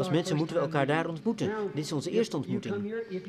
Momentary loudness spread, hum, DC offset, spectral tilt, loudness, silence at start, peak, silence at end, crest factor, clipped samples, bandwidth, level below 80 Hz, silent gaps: 5 LU; none; under 0.1%; -6 dB/octave; -30 LUFS; 0 s; -12 dBFS; 0 s; 18 dB; under 0.1%; 13.5 kHz; -70 dBFS; none